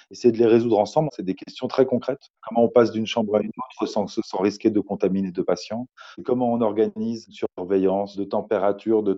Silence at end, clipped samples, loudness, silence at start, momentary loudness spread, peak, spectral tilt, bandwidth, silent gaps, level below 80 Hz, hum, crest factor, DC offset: 0 s; under 0.1%; -23 LUFS; 0.1 s; 12 LU; -4 dBFS; -7 dB/octave; 7.8 kHz; 2.30-2.34 s; -64 dBFS; none; 18 dB; under 0.1%